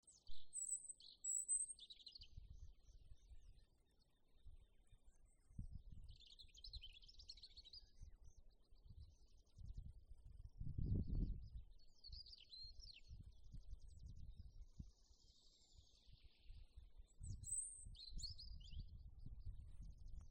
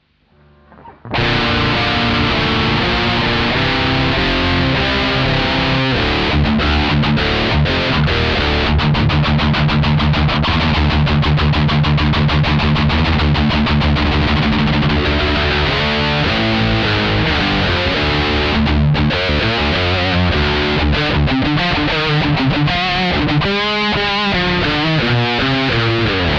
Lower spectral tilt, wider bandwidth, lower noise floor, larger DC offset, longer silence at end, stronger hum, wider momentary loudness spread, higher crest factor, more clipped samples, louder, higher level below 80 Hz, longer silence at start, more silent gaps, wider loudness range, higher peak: second, -3 dB/octave vs -6.5 dB/octave; first, 9.6 kHz vs 7.4 kHz; first, -77 dBFS vs -52 dBFS; neither; about the same, 0 s vs 0 s; neither; first, 20 LU vs 1 LU; first, 20 dB vs 10 dB; neither; second, -52 LUFS vs -14 LUFS; second, -58 dBFS vs -24 dBFS; second, 0.05 s vs 0.85 s; neither; first, 16 LU vs 1 LU; second, -32 dBFS vs -4 dBFS